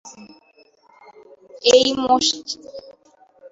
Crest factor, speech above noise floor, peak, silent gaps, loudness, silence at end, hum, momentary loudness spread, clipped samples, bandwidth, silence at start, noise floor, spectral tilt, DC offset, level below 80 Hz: 20 dB; 38 dB; -2 dBFS; none; -17 LUFS; 0.05 s; none; 25 LU; under 0.1%; 8 kHz; 0.05 s; -55 dBFS; -1.5 dB/octave; under 0.1%; -60 dBFS